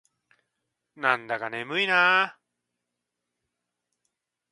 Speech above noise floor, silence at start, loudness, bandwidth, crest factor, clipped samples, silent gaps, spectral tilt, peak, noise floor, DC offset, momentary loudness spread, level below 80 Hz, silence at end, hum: 59 dB; 1 s; -24 LUFS; 11.5 kHz; 24 dB; under 0.1%; none; -3.5 dB/octave; -4 dBFS; -84 dBFS; under 0.1%; 11 LU; -84 dBFS; 2.2 s; 60 Hz at -65 dBFS